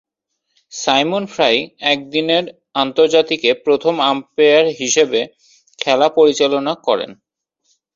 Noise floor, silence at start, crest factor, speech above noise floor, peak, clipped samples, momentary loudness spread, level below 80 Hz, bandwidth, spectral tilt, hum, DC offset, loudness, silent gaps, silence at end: -73 dBFS; 0.75 s; 16 dB; 58 dB; 0 dBFS; under 0.1%; 8 LU; -62 dBFS; 7.6 kHz; -2.5 dB/octave; none; under 0.1%; -15 LUFS; none; 0.8 s